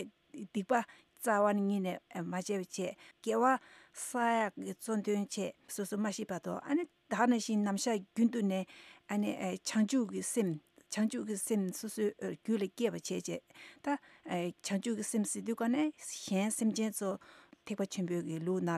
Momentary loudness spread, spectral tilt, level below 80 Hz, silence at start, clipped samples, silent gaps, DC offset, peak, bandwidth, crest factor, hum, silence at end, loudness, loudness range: 11 LU; -5 dB/octave; -84 dBFS; 0 s; under 0.1%; none; under 0.1%; -16 dBFS; 15 kHz; 18 dB; none; 0 s; -35 LUFS; 3 LU